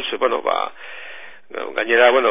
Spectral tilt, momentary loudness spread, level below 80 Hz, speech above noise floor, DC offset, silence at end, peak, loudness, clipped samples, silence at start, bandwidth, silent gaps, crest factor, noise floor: -5.5 dB/octave; 21 LU; -64 dBFS; 22 dB; 1%; 0 s; 0 dBFS; -18 LUFS; under 0.1%; 0 s; 3.9 kHz; none; 20 dB; -39 dBFS